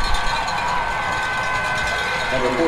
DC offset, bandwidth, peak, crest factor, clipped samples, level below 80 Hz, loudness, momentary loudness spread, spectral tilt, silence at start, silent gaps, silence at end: under 0.1%; 14 kHz; -6 dBFS; 14 dB; under 0.1%; -30 dBFS; -21 LUFS; 1 LU; -3.5 dB/octave; 0 s; none; 0 s